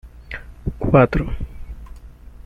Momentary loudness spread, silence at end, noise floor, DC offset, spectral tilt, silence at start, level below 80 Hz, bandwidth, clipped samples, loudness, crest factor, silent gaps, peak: 24 LU; 0.05 s; -39 dBFS; under 0.1%; -9.5 dB/octave; 0.05 s; -32 dBFS; 6.8 kHz; under 0.1%; -19 LUFS; 20 dB; none; -2 dBFS